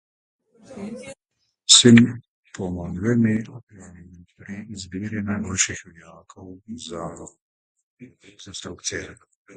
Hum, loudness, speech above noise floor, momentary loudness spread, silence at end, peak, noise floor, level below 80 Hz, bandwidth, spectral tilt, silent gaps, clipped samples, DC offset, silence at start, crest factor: none; -19 LUFS; 53 dB; 25 LU; 0.4 s; 0 dBFS; -75 dBFS; -50 dBFS; 9.6 kHz; -3.5 dB/octave; 2.28-2.43 s, 3.63-3.67 s, 7.41-7.75 s, 7.83-7.97 s; under 0.1%; under 0.1%; 0.7 s; 24 dB